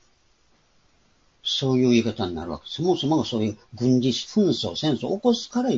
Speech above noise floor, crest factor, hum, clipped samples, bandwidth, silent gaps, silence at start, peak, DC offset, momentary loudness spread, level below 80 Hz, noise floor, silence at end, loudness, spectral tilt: 41 dB; 16 dB; none; under 0.1%; 7.8 kHz; none; 1.45 s; -8 dBFS; under 0.1%; 9 LU; -56 dBFS; -63 dBFS; 0 s; -23 LUFS; -6 dB/octave